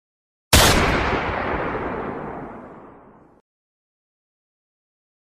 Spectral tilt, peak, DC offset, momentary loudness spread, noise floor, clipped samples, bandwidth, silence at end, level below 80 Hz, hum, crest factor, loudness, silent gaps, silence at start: -3.5 dB/octave; 0 dBFS; under 0.1%; 20 LU; -48 dBFS; under 0.1%; 15.5 kHz; 2.4 s; -32 dBFS; none; 24 dB; -19 LUFS; none; 0.5 s